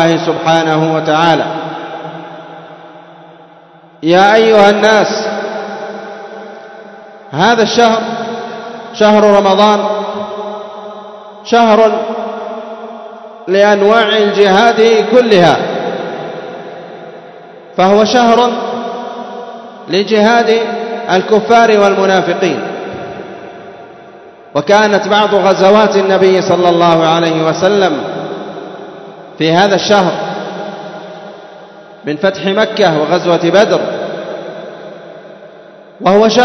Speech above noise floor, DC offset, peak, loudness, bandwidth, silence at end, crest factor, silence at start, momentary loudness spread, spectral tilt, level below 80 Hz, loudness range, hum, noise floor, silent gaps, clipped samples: 31 dB; under 0.1%; 0 dBFS; -10 LUFS; 8.6 kHz; 0 s; 12 dB; 0 s; 21 LU; -5 dB/octave; -56 dBFS; 6 LU; none; -40 dBFS; none; 0.5%